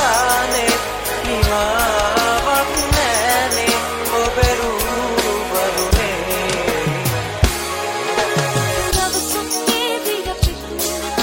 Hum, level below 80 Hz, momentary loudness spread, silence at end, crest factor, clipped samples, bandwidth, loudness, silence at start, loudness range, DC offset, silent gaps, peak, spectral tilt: none; -28 dBFS; 5 LU; 0 s; 16 dB; under 0.1%; 17 kHz; -17 LUFS; 0 s; 2 LU; under 0.1%; none; 0 dBFS; -3 dB/octave